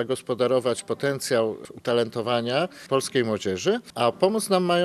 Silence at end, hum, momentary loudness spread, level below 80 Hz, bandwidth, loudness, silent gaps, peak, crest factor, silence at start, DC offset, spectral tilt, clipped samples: 0 s; none; 5 LU; -70 dBFS; 14 kHz; -25 LUFS; none; -6 dBFS; 18 dB; 0 s; under 0.1%; -4.5 dB/octave; under 0.1%